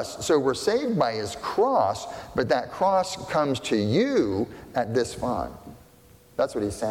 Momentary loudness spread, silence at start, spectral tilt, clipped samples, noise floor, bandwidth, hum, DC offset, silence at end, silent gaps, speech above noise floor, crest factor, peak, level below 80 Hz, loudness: 8 LU; 0 s; -5 dB/octave; under 0.1%; -53 dBFS; 17 kHz; none; under 0.1%; 0 s; none; 29 dB; 16 dB; -10 dBFS; -52 dBFS; -25 LUFS